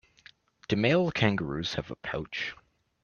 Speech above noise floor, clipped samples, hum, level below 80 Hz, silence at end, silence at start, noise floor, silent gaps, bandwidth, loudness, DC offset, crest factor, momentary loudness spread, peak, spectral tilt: 30 dB; under 0.1%; none; -56 dBFS; 0.5 s; 0.7 s; -58 dBFS; none; 7.2 kHz; -29 LUFS; under 0.1%; 22 dB; 11 LU; -8 dBFS; -6 dB/octave